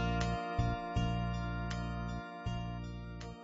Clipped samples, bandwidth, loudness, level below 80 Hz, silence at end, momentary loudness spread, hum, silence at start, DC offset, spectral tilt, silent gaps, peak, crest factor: under 0.1%; 7.6 kHz; -38 LUFS; -44 dBFS; 0 s; 8 LU; none; 0 s; under 0.1%; -6 dB/octave; none; -20 dBFS; 16 dB